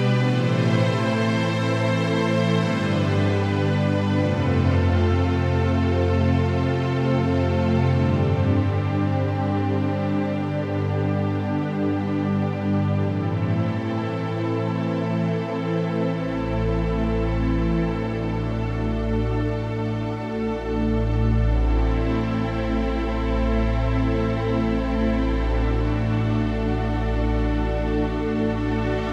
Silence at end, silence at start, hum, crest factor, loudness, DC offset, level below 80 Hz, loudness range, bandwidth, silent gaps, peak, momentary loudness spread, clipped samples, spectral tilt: 0 s; 0 s; none; 14 dB; -23 LUFS; under 0.1%; -30 dBFS; 3 LU; 9 kHz; none; -6 dBFS; 5 LU; under 0.1%; -8 dB/octave